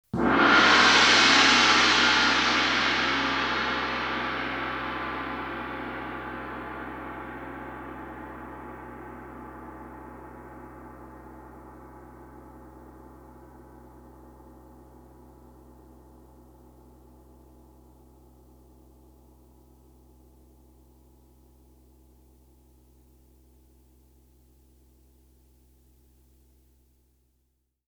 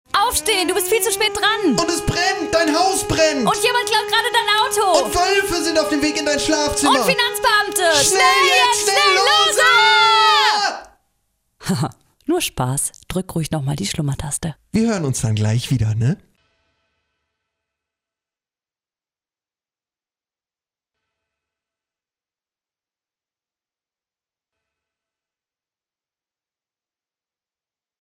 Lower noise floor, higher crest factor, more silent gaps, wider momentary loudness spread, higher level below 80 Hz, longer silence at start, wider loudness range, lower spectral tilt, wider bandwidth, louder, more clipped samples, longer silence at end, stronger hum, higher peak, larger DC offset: second, -74 dBFS vs under -90 dBFS; first, 24 dB vs 18 dB; neither; first, 29 LU vs 11 LU; second, -52 dBFS vs -44 dBFS; about the same, 0.15 s vs 0.15 s; first, 29 LU vs 10 LU; about the same, -2 dB/octave vs -3 dB/octave; first, over 20 kHz vs 16 kHz; second, -22 LUFS vs -16 LUFS; neither; first, 14.5 s vs 11.85 s; neither; about the same, -4 dBFS vs -2 dBFS; neither